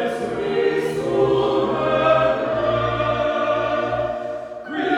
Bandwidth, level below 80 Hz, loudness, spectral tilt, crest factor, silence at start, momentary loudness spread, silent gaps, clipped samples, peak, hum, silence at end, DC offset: 12.5 kHz; -46 dBFS; -20 LUFS; -6.5 dB/octave; 16 dB; 0 s; 8 LU; none; under 0.1%; -4 dBFS; none; 0 s; under 0.1%